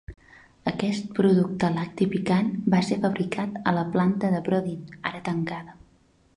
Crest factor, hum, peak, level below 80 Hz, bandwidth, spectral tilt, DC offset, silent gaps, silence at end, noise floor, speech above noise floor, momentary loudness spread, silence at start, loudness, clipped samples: 18 dB; none; -8 dBFS; -56 dBFS; 10.5 kHz; -7.5 dB/octave; under 0.1%; none; 0.65 s; -61 dBFS; 36 dB; 10 LU; 0.1 s; -25 LUFS; under 0.1%